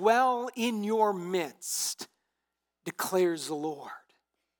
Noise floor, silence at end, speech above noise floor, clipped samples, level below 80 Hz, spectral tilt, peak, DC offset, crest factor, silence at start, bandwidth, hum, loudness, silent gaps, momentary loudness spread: -85 dBFS; 0.6 s; 56 dB; under 0.1%; under -90 dBFS; -3.5 dB/octave; -12 dBFS; under 0.1%; 18 dB; 0 s; 19 kHz; none; -30 LUFS; none; 16 LU